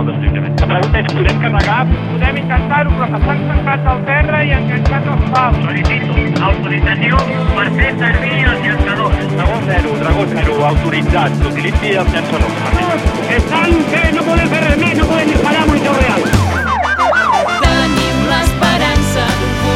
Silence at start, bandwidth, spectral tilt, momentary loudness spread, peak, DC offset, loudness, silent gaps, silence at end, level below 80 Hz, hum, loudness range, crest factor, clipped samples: 0 s; 14.5 kHz; -6 dB/octave; 3 LU; 0 dBFS; under 0.1%; -13 LUFS; none; 0 s; -20 dBFS; none; 2 LU; 12 dB; under 0.1%